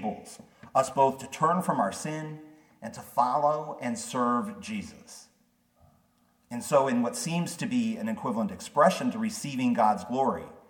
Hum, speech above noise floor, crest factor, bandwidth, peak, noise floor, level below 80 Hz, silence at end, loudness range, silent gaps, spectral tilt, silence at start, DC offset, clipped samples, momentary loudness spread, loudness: none; 40 dB; 20 dB; 18 kHz; -8 dBFS; -68 dBFS; -70 dBFS; 0.1 s; 4 LU; none; -5 dB/octave; 0 s; under 0.1%; under 0.1%; 18 LU; -28 LUFS